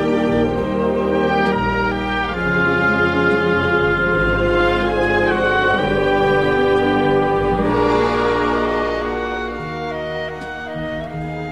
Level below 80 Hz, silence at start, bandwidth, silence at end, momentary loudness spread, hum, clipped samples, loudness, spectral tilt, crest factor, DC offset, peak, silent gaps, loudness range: -34 dBFS; 0 s; 11 kHz; 0 s; 10 LU; none; under 0.1%; -18 LUFS; -7 dB/octave; 14 dB; 0.4%; -4 dBFS; none; 4 LU